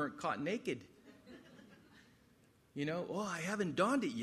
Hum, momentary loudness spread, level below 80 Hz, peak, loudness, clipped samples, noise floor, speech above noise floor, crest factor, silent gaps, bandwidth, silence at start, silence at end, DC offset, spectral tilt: none; 24 LU; -78 dBFS; -20 dBFS; -38 LUFS; under 0.1%; -69 dBFS; 31 dB; 20 dB; none; 14 kHz; 0 s; 0 s; under 0.1%; -5 dB/octave